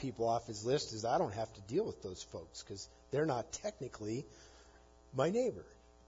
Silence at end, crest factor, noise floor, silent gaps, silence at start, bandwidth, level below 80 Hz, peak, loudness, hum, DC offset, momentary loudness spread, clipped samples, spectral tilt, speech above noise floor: 0.35 s; 20 dB; -62 dBFS; none; 0 s; 7.4 kHz; -64 dBFS; -20 dBFS; -38 LUFS; none; under 0.1%; 13 LU; under 0.1%; -5 dB/octave; 24 dB